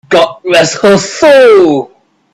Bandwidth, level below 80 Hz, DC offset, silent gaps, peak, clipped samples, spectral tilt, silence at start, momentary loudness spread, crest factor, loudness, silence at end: 14 kHz; -46 dBFS; under 0.1%; none; 0 dBFS; 0.3%; -4 dB/octave; 0.1 s; 8 LU; 8 dB; -7 LUFS; 0.5 s